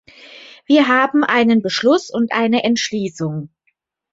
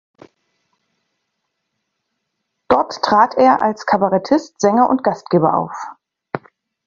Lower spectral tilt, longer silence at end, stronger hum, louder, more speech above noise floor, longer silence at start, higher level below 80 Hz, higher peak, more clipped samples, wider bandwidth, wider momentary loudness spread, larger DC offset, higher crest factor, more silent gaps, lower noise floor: second, -4.5 dB/octave vs -6 dB/octave; first, 0.65 s vs 0.5 s; neither; about the same, -16 LUFS vs -16 LUFS; second, 52 dB vs 59 dB; second, 0.3 s vs 2.7 s; about the same, -62 dBFS vs -58 dBFS; about the same, -2 dBFS vs 0 dBFS; neither; about the same, 7.8 kHz vs 7.4 kHz; second, 10 LU vs 17 LU; neither; about the same, 16 dB vs 18 dB; neither; second, -67 dBFS vs -74 dBFS